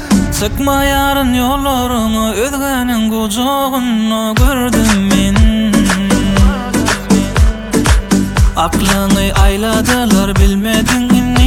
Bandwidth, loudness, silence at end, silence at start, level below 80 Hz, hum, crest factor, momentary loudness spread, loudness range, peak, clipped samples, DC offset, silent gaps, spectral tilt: 18.5 kHz; -12 LUFS; 0 s; 0 s; -18 dBFS; none; 12 dB; 3 LU; 2 LU; 0 dBFS; under 0.1%; under 0.1%; none; -5 dB/octave